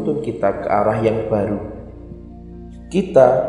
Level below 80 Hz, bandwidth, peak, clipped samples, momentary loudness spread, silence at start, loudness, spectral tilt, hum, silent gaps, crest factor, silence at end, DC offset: -42 dBFS; 11 kHz; 0 dBFS; under 0.1%; 22 LU; 0 s; -18 LUFS; -8 dB/octave; none; none; 18 dB; 0 s; under 0.1%